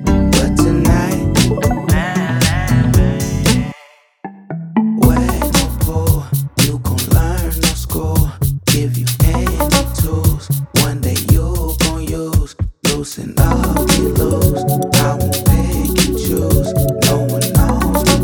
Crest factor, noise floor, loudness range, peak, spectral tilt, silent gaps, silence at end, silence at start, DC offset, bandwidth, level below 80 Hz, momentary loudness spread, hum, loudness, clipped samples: 14 dB; -45 dBFS; 2 LU; 0 dBFS; -5 dB/octave; none; 0 s; 0 s; under 0.1%; over 20 kHz; -22 dBFS; 5 LU; none; -15 LUFS; under 0.1%